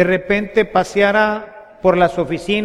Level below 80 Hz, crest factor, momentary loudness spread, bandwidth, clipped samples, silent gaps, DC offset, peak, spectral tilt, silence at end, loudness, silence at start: -42 dBFS; 16 dB; 5 LU; 13.5 kHz; under 0.1%; none; under 0.1%; 0 dBFS; -6 dB/octave; 0 s; -16 LUFS; 0 s